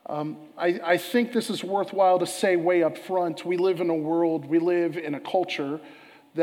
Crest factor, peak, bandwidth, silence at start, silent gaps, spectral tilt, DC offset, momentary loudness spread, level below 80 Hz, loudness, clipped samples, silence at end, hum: 16 dB; -8 dBFS; 16.5 kHz; 0.1 s; none; -5 dB/octave; under 0.1%; 10 LU; -84 dBFS; -25 LUFS; under 0.1%; 0 s; none